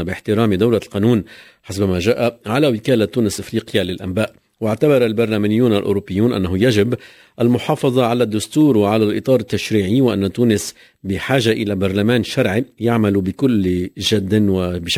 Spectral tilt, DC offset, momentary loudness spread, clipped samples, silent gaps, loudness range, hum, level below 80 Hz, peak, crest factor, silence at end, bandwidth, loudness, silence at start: -6 dB/octave; under 0.1%; 6 LU; under 0.1%; none; 2 LU; none; -40 dBFS; -2 dBFS; 16 dB; 0 s; 16 kHz; -17 LUFS; 0 s